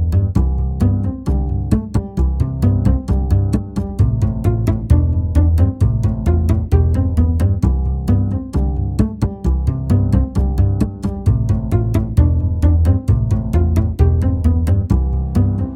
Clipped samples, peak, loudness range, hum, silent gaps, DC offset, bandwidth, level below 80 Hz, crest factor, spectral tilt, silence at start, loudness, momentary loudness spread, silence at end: under 0.1%; 0 dBFS; 2 LU; none; none; under 0.1%; 9.8 kHz; -20 dBFS; 14 dB; -9.5 dB/octave; 0 s; -17 LUFS; 4 LU; 0 s